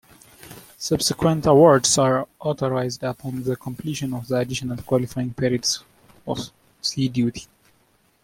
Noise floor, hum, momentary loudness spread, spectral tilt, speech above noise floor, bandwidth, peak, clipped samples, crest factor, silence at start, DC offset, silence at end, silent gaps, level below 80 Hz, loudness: -62 dBFS; none; 15 LU; -4.5 dB/octave; 41 dB; 16.5 kHz; -2 dBFS; under 0.1%; 20 dB; 0.45 s; under 0.1%; 0.8 s; none; -52 dBFS; -22 LUFS